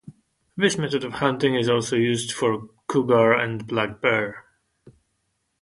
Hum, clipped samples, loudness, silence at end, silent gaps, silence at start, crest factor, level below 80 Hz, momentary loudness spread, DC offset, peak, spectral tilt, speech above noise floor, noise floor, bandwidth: none; under 0.1%; -22 LUFS; 0.7 s; none; 0.05 s; 20 dB; -60 dBFS; 8 LU; under 0.1%; -4 dBFS; -5 dB/octave; 52 dB; -73 dBFS; 11.5 kHz